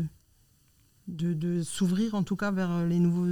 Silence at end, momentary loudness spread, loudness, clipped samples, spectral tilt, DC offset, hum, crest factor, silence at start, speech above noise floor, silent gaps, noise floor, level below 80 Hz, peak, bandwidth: 0 s; 11 LU; -29 LUFS; under 0.1%; -7 dB/octave; under 0.1%; none; 12 dB; 0 s; 37 dB; none; -64 dBFS; -60 dBFS; -16 dBFS; 13 kHz